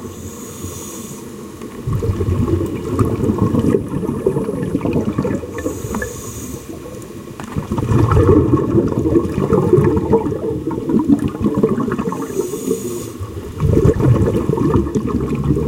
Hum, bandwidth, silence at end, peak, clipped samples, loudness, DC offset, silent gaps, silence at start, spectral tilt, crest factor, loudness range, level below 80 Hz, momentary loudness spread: none; 17 kHz; 0 s; 0 dBFS; under 0.1%; -17 LUFS; under 0.1%; none; 0 s; -8 dB/octave; 16 dB; 7 LU; -32 dBFS; 16 LU